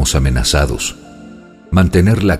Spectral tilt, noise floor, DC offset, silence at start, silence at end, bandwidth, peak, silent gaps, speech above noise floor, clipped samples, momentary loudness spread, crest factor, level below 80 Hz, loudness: -5 dB/octave; -37 dBFS; under 0.1%; 0 s; 0 s; 15.5 kHz; 0 dBFS; none; 24 dB; under 0.1%; 10 LU; 14 dB; -22 dBFS; -14 LUFS